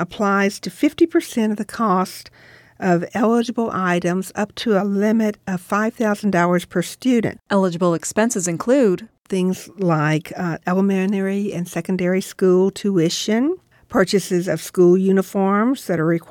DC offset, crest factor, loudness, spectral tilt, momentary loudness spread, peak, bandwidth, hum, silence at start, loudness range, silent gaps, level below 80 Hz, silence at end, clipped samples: under 0.1%; 16 dB; -19 LUFS; -6 dB/octave; 7 LU; -4 dBFS; 17.5 kHz; none; 0 s; 2 LU; none; -58 dBFS; 0.05 s; under 0.1%